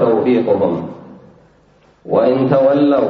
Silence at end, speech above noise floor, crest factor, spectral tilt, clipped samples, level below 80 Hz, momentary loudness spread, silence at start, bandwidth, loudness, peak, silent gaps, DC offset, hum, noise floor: 0 s; 38 dB; 14 dB; -9.5 dB/octave; under 0.1%; -56 dBFS; 8 LU; 0 s; 5.2 kHz; -14 LUFS; -2 dBFS; none; under 0.1%; none; -51 dBFS